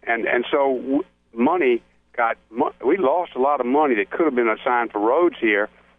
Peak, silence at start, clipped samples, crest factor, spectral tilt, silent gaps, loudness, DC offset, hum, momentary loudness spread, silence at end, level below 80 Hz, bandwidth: -6 dBFS; 0.05 s; under 0.1%; 14 dB; -8 dB/octave; none; -21 LUFS; under 0.1%; none; 6 LU; 0.3 s; -62 dBFS; 3.8 kHz